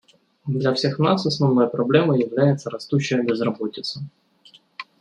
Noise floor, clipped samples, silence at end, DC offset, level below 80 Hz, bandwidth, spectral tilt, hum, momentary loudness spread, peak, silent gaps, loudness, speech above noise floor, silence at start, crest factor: -53 dBFS; under 0.1%; 0.15 s; under 0.1%; -66 dBFS; 9.8 kHz; -6.5 dB/octave; none; 17 LU; -2 dBFS; none; -21 LUFS; 33 dB; 0.45 s; 18 dB